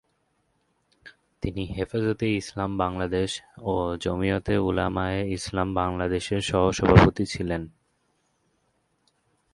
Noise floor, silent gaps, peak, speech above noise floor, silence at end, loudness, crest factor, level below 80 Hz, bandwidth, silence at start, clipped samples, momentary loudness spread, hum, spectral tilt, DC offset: -71 dBFS; none; 0 dBFS; 47 dB; 1.85 s; -25 LUFS; 26 dB; -40 dBFS; 11.5 kHz; 1.05 s; under 0.1%; 12 LU; none; -6 dB/octave; under 0.1%